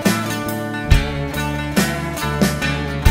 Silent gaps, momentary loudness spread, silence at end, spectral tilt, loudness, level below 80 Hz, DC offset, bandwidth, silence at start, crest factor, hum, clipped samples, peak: none; 5 LU; 0 s; -5 dB/octave; -20 LUFS; -26 dBFS; under 0.1%; 16.5 kHz; 0 s; 18 dB; none; under 0.1%; 0 dBFS